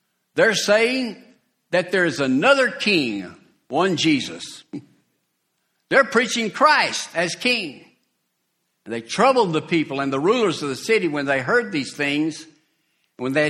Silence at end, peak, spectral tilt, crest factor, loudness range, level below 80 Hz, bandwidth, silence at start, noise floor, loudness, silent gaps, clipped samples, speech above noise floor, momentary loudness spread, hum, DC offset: 0 s; -2 dBFS; -4 dB/octave; 20 dB; 3 LU; -66 dBFS; 15 kHz; 0.35 s; -73 dBFS; -20 LUFS; none; under 0.1%; 53 dB; 15 LU; none; under 0.1%